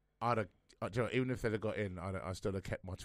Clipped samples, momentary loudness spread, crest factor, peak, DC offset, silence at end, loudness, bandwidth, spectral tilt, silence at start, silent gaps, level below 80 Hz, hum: under 0.1%; 7 LU; 18 dB; -20 dBFS; under 0.1%; 0 s; -39 LUFS; 15 kHz; -6.5 dB/octave; 0.2 s; none; -58 dBFS; none